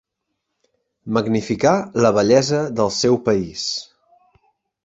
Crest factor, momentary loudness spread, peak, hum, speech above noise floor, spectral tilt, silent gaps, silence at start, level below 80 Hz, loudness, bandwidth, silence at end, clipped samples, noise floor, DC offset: 18 dB; 9 LU; -2 dBFS; none; 59 dB; -5 dB/octave; none; 1.05 s; -52 dBFS; -18 LUFS; 8 kHz; 1 s; under 0.1%; -77 dBFS; under 0.1%